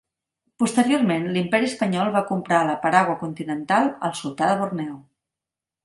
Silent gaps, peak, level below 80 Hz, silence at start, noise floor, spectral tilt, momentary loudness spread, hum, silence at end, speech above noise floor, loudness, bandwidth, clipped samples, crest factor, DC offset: none; 0 dBFS; -66 dBFS; 0.6 s; -88 dBFS; -5.5 dB/octave; 9 LU; none; 0.85 s; 67 dB; -22 LUFS; 11.5 kHz; under 0.1%; 22 dB; under 0.1%